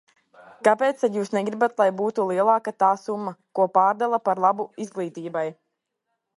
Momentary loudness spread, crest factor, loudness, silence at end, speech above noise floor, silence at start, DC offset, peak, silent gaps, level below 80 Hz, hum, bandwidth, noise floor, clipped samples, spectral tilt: 11 LU; 18 dB; -23 LUFS; 0.85 s; 57 dB; 0.6 s; under 0.1%; -4 dBFS; none; -78 dBFS; none; 11.5 kHz; -79 dBFS; under 0.1%; -6 dB/octave